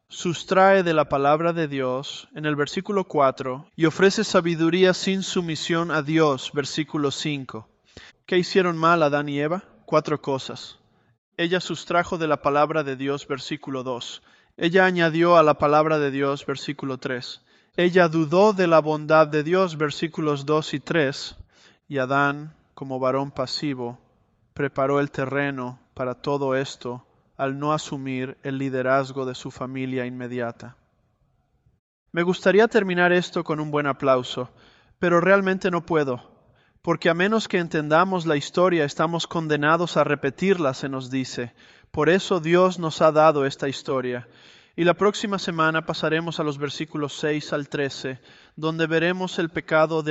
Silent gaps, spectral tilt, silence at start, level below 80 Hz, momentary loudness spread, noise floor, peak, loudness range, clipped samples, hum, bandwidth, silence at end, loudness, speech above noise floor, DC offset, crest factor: 11.18-11.32 s, 31.79-32.06 s; -5.5 dB/octave; 0.1 s; -60 dBFS; 13 LU; -66 dBFS; -4 dBFS; 6 LU; under 0.1%; none; 8.2 kHz; 0 s; -22 LUFS; 44 dB; under 0.1%; 20 dB